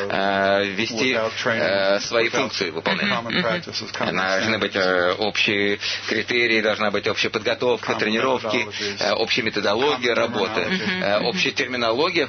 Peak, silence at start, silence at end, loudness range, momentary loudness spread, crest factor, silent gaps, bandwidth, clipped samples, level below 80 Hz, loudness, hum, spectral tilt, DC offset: -4 dBFS; 0 s; 0 s; 1 LU; 4 LU; 16 dB; none; 6.6 kHz; under 0.1%; -60 dBFS; -21 LUFS; none; -3.5 dB/octave; under 0.1%